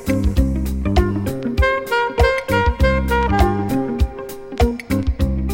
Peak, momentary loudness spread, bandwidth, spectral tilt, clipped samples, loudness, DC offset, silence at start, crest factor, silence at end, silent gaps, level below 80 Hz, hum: -2 dBFS; 6 LU; 16.5 kHz; -6.5 dB/octave; under 0.1%; -19 LUFS; under 0.1%; 0 s; 16 dB; 0 s; none; -22 dBFS; none